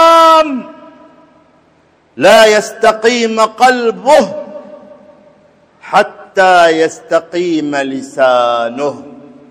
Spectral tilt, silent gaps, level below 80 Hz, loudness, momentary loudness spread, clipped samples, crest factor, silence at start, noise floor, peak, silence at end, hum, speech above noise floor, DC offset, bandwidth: -3 dB/octave; none; -54 dBFS; -10 LUFS; 14 LU; 0.9%; 12 dB; 0 s; -50 dBFS; 0 dBFS; 0.35 s; none; 40 dB; under 0.1%; 16 kHz